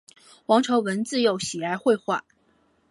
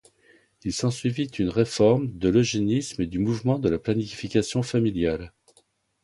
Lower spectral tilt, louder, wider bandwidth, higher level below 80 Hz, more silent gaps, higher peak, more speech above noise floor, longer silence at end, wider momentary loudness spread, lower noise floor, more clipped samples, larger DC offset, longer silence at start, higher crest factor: second, -4 dB/octave vs -6 dB/octave; about the same, -24 LUFS vs -25 LUFS; about the same, 11.5 kHz vs 11.5 kHz; second, -68 dBFS vs -48 dBFS; neither; about the same, -6 dBFS vs -8 dBFS; about the same, 41 dB vs 41 dB; about the same, 0.7 s vs 0.75 s; about the same, 9 LU vs 7 LU; about the same, -64 dBFS vs -64 dBFS; neither; neither; second, 0.5 s vs 0.65 s; about the same, 20 dB vs 18 dB